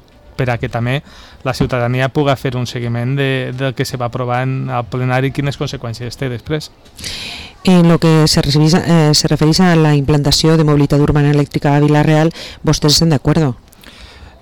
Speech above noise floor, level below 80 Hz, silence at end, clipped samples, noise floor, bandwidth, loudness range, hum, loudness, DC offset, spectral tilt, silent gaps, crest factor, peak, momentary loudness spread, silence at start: 25 dB; -34 dBFS; 0.1 s; under 0.1%; -38 dBFS; 18 kHz; 8 LU; none; -14 LUFS; under 0.1%; -5.5 dB/octave; none; 10 dB; -4 dBFS; 12 LU; 0.4 s